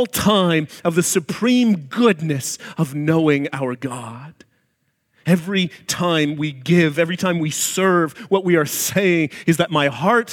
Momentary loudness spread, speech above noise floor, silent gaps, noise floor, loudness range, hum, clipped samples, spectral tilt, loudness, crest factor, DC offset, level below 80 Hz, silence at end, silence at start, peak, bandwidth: 8 LU; 50 dB; none; -68 dBFS; 4 LU; none; under 0.1%; -4.5 dB/octave; -18 LUFS; 16 dB; under 0.1%; -56 dBFS; 0 s; 0 s; -2 dBFS; 18 kHz